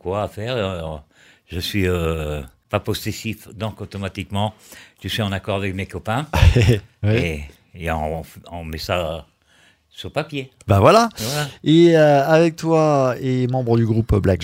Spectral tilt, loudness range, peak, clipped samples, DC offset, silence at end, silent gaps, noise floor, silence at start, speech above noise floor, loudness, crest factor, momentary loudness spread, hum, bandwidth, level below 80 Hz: -6.5 dB/octave; 10 LU; 0 dBFS; under 0.1%; under 0.1%; 0 s; none; -56 dBFS; 0.05 s; 37 dB; -19 LUFS; 20 dB; 16 LU; none; 16 kHz; -34 dBFS